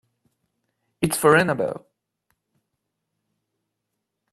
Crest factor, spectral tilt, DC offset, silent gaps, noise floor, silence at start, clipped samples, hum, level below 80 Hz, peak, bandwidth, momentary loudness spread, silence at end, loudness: 24 dB; -4.5 dB/octave; under 0.1%; none; -80 dBFS; 1 s; under 0.1%; none; -62 dBFS; -2 dBFS; 14.5 kHz; 12 LU; 2.55 s; -20 LUFS